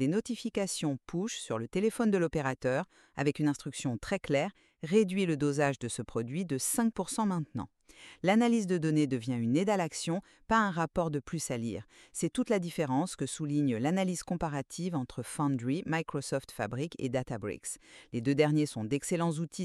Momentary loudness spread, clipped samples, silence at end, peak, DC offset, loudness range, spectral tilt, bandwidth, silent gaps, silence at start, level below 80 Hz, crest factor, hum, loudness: 9 LU; under 0.1%; 0 s; -12 dBFS; under 0.1%; 3 LU; -5.5 dB/octave; 13 kHz; none; 0 s; -60 dBFS; 20 dB; none; -32 LUFS